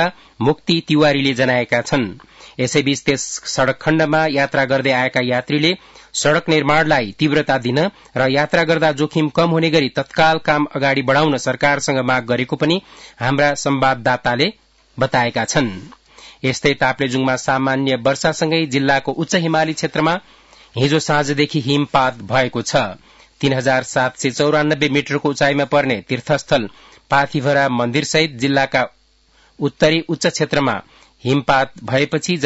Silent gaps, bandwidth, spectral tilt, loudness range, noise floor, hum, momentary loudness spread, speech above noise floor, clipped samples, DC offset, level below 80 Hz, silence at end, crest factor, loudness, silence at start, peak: none; 8 kHz; -4.5 dB/octave; 2 LU; -54 dBFS; none; 5 LU; 38 dB; under 0.1%; under 0.1%; -50 dBFS; 0 s; 14 dB; -17 LUFS; 0 s; -2 dBFS